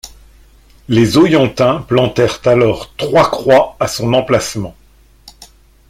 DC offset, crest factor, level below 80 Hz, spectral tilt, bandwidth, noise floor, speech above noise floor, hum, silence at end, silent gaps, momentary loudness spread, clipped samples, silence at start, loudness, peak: under 0.1%; 14 dB; -42 dBFS; -5.5 dB/octave; 16 kHz; -46 dBFS; 34 dB; none; 0.45 s; none; 8 LU; under 0.1%; 0.05 s; -13 LUFS; 0 dBFS